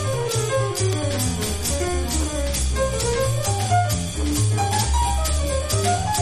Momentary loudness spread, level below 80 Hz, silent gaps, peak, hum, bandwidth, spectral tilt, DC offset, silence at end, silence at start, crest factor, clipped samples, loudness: 3 LU; -28 dBFS; none; -8 dBFS; none; 13.5 kHz; -4 dB/octave; under 0.1%; 0 s; 0 s; 14 dB; under 0.1%; -22 LUFS